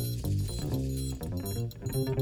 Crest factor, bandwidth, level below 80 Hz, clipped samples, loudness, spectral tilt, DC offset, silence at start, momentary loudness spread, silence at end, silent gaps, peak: 14 dB; 19.5 kHz; -42 dBFS; under 0.1%; -33 LUFS; -6.5 dB/octave; under 0.1%; 0 s; 3 LU; 0 s; none; -18 dBFS